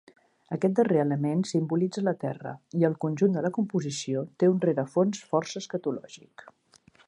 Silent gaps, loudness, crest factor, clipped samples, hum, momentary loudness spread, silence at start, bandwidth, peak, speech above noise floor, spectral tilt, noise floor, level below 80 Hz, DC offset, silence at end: none; -27 LUFS; 18 dB; under 0.1%; none; 10 LU; 0.5 s; 11 kHz; -10 dBFS; 33 dB; -6.5 dB/octave; -60 dBFS; -74 dBFS; under 0.1%; 0.9 s